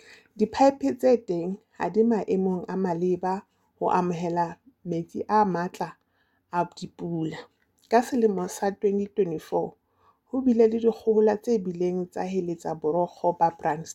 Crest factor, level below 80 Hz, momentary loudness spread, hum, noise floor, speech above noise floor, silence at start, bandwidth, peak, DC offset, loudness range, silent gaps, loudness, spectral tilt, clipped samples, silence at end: 18 dB; -66 dBFS; 11 LU; none; -70 dBFS; 45 dB; 0.35 s; 13.5 kHz; -8 dBFS; under 0.1%; 4 LU; none; -26 LUFS; -7 dB/octave; under 0.1%; 0 s